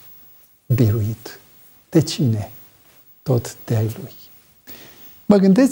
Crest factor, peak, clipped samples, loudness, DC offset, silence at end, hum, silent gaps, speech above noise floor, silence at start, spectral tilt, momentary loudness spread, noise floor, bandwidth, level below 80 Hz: 18 dB; -2 dBFS; under 0.1%; -19 LUFS; under 0.1%; 0 s; none; none; 33 dB; 0.7 s; -7 dB/octave; 24 LU; -50 dBFS; 18 kHz; -56 dBFS